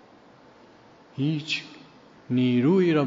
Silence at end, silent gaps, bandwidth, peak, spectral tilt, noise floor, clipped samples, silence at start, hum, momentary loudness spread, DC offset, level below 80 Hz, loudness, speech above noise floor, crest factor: 0 s; none; 7.4 kHz; -10 dBFS; -6 dB/octave; -53 dBFS; under 0.1%; 1.15 s; none; 16 LU; under 0.1%; -72 dBFS; -24 LUFS; 30 dB; 16 dB